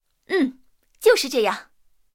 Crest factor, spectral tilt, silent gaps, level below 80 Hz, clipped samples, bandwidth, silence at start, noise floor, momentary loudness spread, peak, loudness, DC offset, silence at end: 18 dB; -2.5 dB/octave; none; -66 dBFS; under 0.1%; 17 kHz; 0.3 s; -55 dBFS; 8 LU; -4 dBFS; -21 LUFS; under 0.1%; 0.5 s